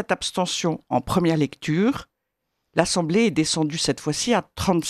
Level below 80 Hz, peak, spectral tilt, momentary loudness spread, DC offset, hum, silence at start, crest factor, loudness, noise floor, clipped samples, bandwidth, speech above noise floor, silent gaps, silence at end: -50 dBFS; -2 dBFS; -4.5 dB/octave; 4 LU; under 0.1%; none; 0 s; 20 dB; -22 LUFS; -79 dBFS; under 0.1%; 13.5 kHz; 56 dB; none; 0 s